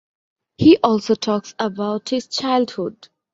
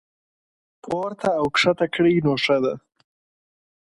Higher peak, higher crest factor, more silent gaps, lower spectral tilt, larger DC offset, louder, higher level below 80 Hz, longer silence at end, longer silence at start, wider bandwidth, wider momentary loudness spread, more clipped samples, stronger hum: first, -2 dBFS vs -6 dBFS; about the same, 18 dB vs 18 dB; neither; about the same, -5.5 dB/octave vs -5.5 dB/octave; neither; about the same, -19 LUFS vs -21 LUFS; about the same, -54 dBFS vs -58 dBFS; second, 0.4 s vs 1.1 s; second, 0.6 s vs 0.85 s; second, 7.8 kHz vs 11.5 kHz; about the same, 11 LU vs 9 LU; neither; neither